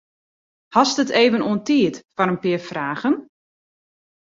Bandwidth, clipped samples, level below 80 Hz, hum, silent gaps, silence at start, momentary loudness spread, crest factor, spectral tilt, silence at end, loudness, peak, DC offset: 7.8 kHz; under 0.1%; -64 dBFS; none; 2.05-2.09 s; 0.7 s; 7 LU; 20 dB; -4.5 dB/octave; 1 s; -20 LUFS; -2 dBFS; under 0.1%